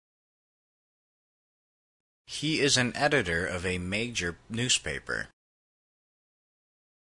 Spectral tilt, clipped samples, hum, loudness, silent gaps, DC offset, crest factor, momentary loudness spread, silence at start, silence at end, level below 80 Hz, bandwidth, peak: -3 dB/octave; under 0.1%; none; -28 LUFS; none; under 0.1%; 22 dB; 11 LU; 2.3 s; 1.9 s; -58 dBFS; 11 kHz; -10 dBFS